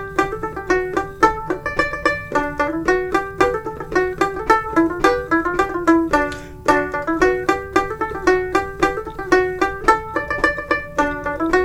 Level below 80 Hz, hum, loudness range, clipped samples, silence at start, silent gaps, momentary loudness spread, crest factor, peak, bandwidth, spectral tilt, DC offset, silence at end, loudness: -38 dBFS; none; 2 LU; under 0.1%; 0 s; none; 6 LU; 20 dB; 0 dBFS; 15.5 kHz; -5 dB/octave; under 0.1%; 0 s; -19 LUFS